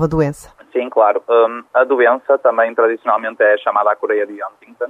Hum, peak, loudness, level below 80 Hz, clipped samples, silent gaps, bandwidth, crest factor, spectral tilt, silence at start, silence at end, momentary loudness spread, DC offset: none; -2 dBFS; -15 LUFS; -46 dBFS; under 0.1%; none; 12 kHz; 14 dB; -7 dB/octave; 0 s; 0 s; 10 LU; under 0.1%